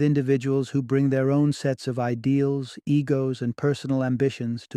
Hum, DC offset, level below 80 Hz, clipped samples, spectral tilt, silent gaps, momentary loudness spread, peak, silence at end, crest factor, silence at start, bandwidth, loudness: none; under 0.1%; -64 dBFS; under 0.1%; -8 dB/octave; none; 5 LU; -10 dBFS; 0 s; 12 dB; 0 s; 10.5 kHz; -24 LUFS